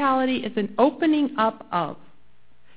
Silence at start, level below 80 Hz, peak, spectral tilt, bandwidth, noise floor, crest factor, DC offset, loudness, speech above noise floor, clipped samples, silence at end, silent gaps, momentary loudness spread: 0 s; -62 dBFS; -4 dBFS; -9.5 dB/octave; 4 kHz; -62 dBFS; 20 dB; 0.6%; -23 LUFS; 39 dB; under 0.1%; 0.8 s; none; 8 LU